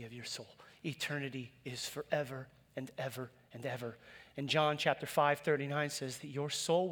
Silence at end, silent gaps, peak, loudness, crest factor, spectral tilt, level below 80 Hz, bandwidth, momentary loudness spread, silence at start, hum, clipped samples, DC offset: 0 s; none; -16 dBFS; -37 LUFS; 22 dB; -4 dB/octave; -76 dBFS; over 20 kHz; 15 LU; 0 s; none; under 0.1%; under 0.1%